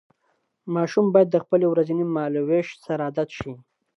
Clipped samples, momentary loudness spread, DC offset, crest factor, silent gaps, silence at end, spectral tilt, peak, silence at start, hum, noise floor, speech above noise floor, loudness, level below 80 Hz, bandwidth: under 0.1%; 12 LU; under 0.1%; 18 dB; none; 0.4 s; -8 dB/octave; -4 dBFS; 0.65 s; none; -71 dBFS; 49 dB; -22 LUFS; -60 dBFS; 7.6 kHz